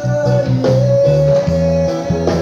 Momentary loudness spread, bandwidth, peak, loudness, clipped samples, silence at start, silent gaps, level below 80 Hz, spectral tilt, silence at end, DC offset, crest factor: 5 LU; 7.6 kHz; 0 dBFS; -14 LUFS; under 0.1%; 0 s; none; -32 dBFS; -8 dB/octave; 0 s; under 0.1%; 12 dB